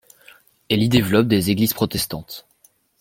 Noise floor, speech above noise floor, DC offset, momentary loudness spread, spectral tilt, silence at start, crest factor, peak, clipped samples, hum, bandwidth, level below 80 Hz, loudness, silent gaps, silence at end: -58 dBFS; 40 dB; under 0.1%; 16 LU; -5 dB/octave; 0.7 s; 20 dB; -2 dBFS; under 0.1%; none; 16.5 kHz; -48 dBFS; -19 LUFS; none; 0.6 s